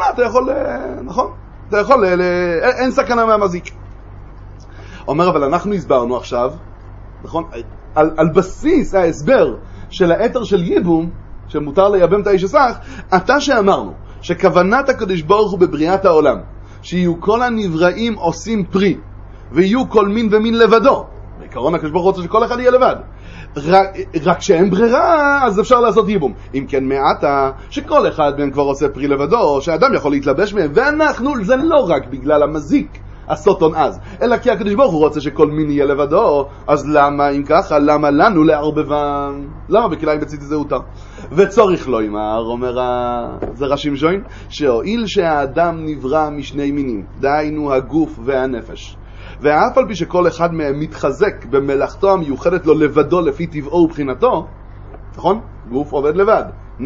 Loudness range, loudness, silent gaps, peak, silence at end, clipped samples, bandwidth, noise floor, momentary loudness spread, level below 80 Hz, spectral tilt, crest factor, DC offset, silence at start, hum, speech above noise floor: 4 LU; -15 LUFS; none; 0 dBFS; 0 s; under 0.1%; 7.8 kHz; -34 dBFS; 11 LU; -36 dBFS; -6.5 dB/octave; 14 dB; under 0.1%; 0 s; none; 20 dB